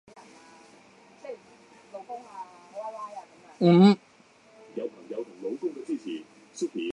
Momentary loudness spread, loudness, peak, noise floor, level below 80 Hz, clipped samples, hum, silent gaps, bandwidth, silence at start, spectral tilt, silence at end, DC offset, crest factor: 26 LU; -26 LUFS; -6 dBFS; -58 dBFS; -76 dBFS; under 0.1%; none; none; 10 kHz; 0.15 s; -7.5 dB/octave; 0 s; under 0.1%; 22 dB